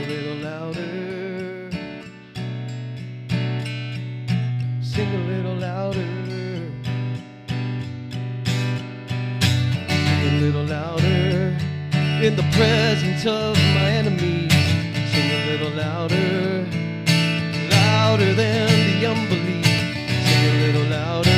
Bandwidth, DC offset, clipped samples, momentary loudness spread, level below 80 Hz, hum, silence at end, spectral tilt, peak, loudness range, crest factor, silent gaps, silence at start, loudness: 16 kHz; under 0.1%; under 0.1%; 13 LU; -54 dBFS; none; 0 s; -5.5 dB/octave; -2 dBFS; 9 LU; 18 dB; none; 0 s; -21 LUFS